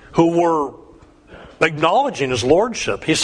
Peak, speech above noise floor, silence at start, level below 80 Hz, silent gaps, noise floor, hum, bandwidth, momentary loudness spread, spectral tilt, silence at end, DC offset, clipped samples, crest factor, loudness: 0 dBFS; 29 dB; 0.1 s; -46 dBFS; none; -46 dBFS; none; 10.5 kHz; 6 LU; -4.5 dB/octave; 0 s; under 0.1%; under 0.1%; 18 dB; -18 LUFS